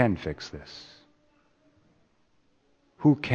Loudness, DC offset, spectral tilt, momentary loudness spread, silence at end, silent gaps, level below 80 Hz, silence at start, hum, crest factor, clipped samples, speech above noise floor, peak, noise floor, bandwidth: -28 LUFS; under 0.1%; -7.5 dB/octave; 21 LU; 0 s; none; -56 dBFS; 0 s; none; 24 dB; under 0.1%; 40 dB; -6 dBFS; -66 dBFS; 7.2 kHz